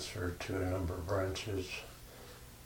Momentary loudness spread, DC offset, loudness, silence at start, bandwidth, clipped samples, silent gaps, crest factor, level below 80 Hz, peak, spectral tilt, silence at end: 16 LU; under 0.1%; -38 LUFS; 0 s; 19.5 kHz; under 0.1%; none; 16 dB; -52 dBFS; -22 dBFS; -5 dB/octave; 0 s